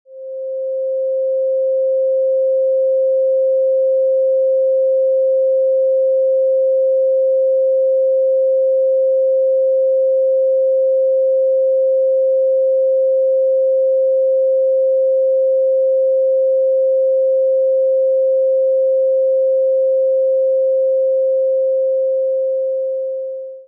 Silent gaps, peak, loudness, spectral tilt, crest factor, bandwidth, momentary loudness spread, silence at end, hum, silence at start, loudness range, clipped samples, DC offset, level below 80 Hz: none; -10 dBFS; -15 LUFS; -9.5 dB/octave; 4 dB; 0.6 kHz; 3 LU; 0.05 s; none; 0.1 s; 1 LU; under 0.1%; under 0.1%; under -90 dBFS